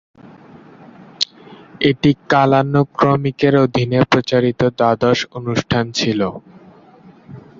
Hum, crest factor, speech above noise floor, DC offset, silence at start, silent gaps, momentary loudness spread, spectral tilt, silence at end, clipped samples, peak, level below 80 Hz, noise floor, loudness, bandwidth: none; 16 dB; 29 dB; under 0.1%; 0.25 s; none; 8 LU; -6 dB/octave; 0.2 s; under 0.1%; 0 dBFS; -48 dBFS; -45 dBFS; -16 LUFS; 7.6 kHz